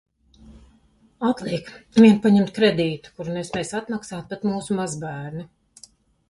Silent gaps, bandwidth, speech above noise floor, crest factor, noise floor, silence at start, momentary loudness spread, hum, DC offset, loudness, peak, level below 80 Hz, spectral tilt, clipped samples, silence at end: none; 11.5 kHz; 37 dB; 20 dB; -58 dBFS; 0.5 s; 17 LU; none; under 0.1%; -22 LUFS; -4 dBFS; -56 dBFS; -6 dB/octave; under 0.1%; 0.85 s